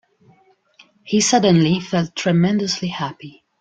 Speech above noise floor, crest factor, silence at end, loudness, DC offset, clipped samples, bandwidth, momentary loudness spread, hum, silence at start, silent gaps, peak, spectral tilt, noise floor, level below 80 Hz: 38 dB; 16 dB; 0.3 s; -18 LUFS; under 0.1%; under 0.1%; 9.2 kHz; 12 LU; none; 1.05 s; none; -2 dBFS; -5 dB/octave; -56 dBFS; -58 dBFS